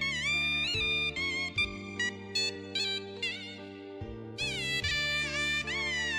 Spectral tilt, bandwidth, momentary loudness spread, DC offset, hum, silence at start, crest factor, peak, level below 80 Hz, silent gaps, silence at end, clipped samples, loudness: -2.5 dB/octave; 15.5 kHz; 14 LU; under 0.1%; none; 0 s; 16 dB; -18 dBFS; -54 dBFS; none; 0 s; under 0.1%; -30 LUFS